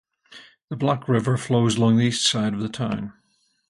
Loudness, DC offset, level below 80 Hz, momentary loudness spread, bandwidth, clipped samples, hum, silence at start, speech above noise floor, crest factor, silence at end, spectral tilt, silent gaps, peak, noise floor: -22 LUFS; under 0.1%; -56 dBFS; 10 LU; 11.5 kHz; under 0.1%; none; 0.3 s; 27 dB; 18 dB; 0.6 s; -5 dB/octave; 0.64-0.68 s; -6 dBFS; -49 dBFS